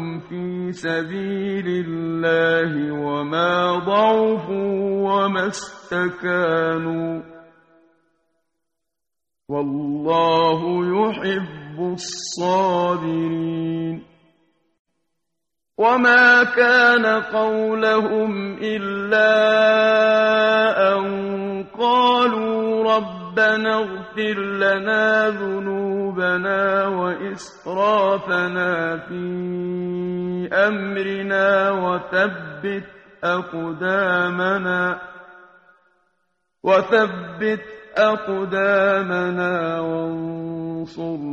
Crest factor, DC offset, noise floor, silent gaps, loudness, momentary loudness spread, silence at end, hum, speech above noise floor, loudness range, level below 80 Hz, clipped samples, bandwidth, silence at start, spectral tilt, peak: 18 dB; under 0.1%; -85 dBFS; 14.79-14.85 s; -19 LUFS; 12 LU; 0 s; none; 66 dB; 7 LU; -62 dBFS; under 0.1%; 9 kHz; 0 s; -5.5 dB/octave; -2 dBFS